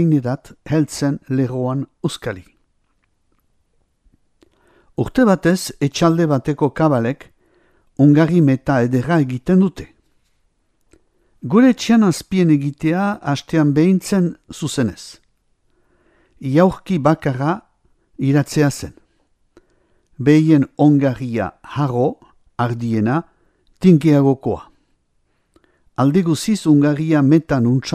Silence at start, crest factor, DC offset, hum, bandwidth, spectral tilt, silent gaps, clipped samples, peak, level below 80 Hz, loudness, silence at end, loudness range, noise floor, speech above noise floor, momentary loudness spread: 0 s; 18 dB; under 0.1%; none; 14.5 kHz; -7 dB/octave; none; under 0.1%; 0 dBFS; -50 dBFS; -17 LUFS; 0 s; 6 LU; -64 dBFS; 48 dB; 12 LU